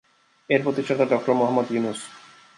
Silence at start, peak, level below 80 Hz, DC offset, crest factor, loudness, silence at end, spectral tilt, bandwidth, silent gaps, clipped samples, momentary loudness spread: 0.5 s; -6 dBFS; -72 dBFS; under 0.1%; 18 dB; -23 LUFS; 0.4 s; -6 dB/octave; 11.5 kHz; none; under 0.1%; 10 LU